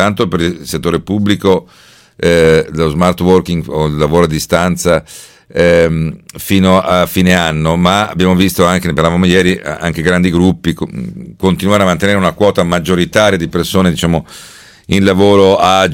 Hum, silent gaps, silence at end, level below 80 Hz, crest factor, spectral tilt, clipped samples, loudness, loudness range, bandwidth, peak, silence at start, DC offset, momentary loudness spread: none; none; 0 s; -36 dBFS; 12 dB; -5.5 dB/octave; 0.5%; -11 LUFS; 2 LU; 17 kHz; 0 dBFS; 0 s; under 0.1%; 8 LU